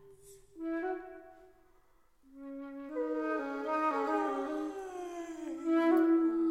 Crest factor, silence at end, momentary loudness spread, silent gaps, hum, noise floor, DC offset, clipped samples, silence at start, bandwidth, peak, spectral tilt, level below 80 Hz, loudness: 16 dB; 0 s; 17 LU; none; none; -69 dBFS; under 0.1%; under 0.1%; 0.05 s; 10 kHz; -18 dBFS; -5 dB/octave; -70 dBFS; -33 LUFS